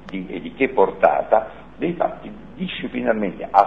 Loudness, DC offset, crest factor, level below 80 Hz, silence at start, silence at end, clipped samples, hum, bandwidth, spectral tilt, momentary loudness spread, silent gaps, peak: -21 LUFS; 0.5%; 20 dB; -50 dBFS; 0 s; 0 s; under 0.1%; none; 6.4 kHz; -8 dB/octave; 15 LU; none; 0 dBFS